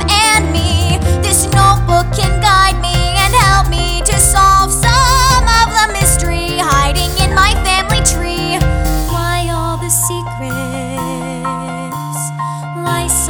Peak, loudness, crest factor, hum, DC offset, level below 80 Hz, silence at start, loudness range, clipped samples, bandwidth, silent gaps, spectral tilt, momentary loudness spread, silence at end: 0 dBFS; -12 LUFS; 12 dB; none; under 0.1%; -18 dBFS; 0 s; 7 LU; under 0.1%; over 20 kHz; none; -3 dB/octave; 11 LU; 0 s